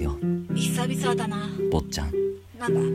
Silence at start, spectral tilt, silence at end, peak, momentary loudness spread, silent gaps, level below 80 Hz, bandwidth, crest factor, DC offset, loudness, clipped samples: 0 s; -5.5 dB/octave; 0 s; -10 dBFS; 4 LU; none; -38 dBFS; 15 kHz; 16 dB; under 0.1%; -27 LUFS; under 0.1%